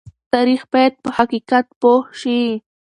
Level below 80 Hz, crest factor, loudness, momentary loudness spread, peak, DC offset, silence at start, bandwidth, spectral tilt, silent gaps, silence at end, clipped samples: -58 dBFS; 16 dB; -17 LUFS; 5 LU; 0 dBFS; under 0.1%; 0.35 s; 10 kHz; -5 dB/octave; 1.76-1.81 s; 0.3 s; under 0.1%